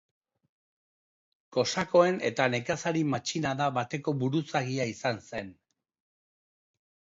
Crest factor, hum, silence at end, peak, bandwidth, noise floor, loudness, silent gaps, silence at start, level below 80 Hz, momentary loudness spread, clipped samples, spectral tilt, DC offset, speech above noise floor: 22 dB; none; 1.6 s; -10 dBFS; 7.8 kHz; under -90 dBFS; -29 LUFS; none; 1.5 s; -68 dBFS; 10 LU; under 0.1%; -5 dB/octave; under 0.1%; over 61 dB